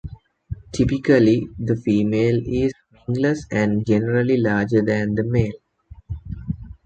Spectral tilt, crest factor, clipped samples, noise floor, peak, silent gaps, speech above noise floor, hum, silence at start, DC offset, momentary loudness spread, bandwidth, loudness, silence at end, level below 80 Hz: -8 dB/octave; 16 dB; under 0.1%; -46 dBFS; -4 dBFS; none; 27 dB; none; 0.05 s; under 0.1%; 16 LU; 8.8 kHz; -20 LUFS; 0.15 s; -40 dBFS